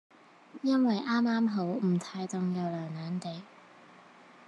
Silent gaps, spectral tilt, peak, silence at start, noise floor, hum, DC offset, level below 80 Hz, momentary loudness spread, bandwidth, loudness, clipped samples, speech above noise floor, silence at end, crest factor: none; -7 dB/octave; -16 dBFS; 0.55 s; -55 dBFS; none; under 0.1%; -88 dBFS; 10 LU; 10.5 kHz; -31 LUFS; under 0.1%; 25 dB; 0.15 s; 14 dB